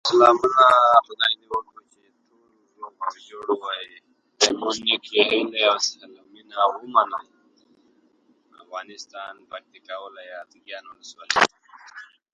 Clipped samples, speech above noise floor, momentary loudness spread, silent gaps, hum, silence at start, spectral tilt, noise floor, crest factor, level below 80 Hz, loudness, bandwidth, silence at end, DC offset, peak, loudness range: under 0.1%; 41 dB; 24 LU; none; none; 0.05 s; -1.5 dB/octave; -63 dBFS; 24 dB; -68 dBFS; -20 LUFS; 11 kHz; 0.3 s; under 0.1%; 0 dBFS; 17 LU